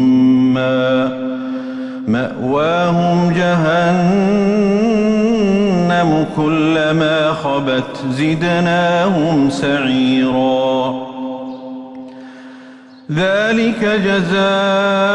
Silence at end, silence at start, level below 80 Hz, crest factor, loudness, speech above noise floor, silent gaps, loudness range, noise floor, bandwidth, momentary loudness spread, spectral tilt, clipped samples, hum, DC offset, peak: 0 s; 0 s; -48 dBFS; 10 dB; -15 LUFS; 24 dB; none; 5 LU; -38 dBFS; 9.8 kHz; 11 LU; -6.5 dB/octave; under 0.1%; none; under 0.1%; -4 dBFS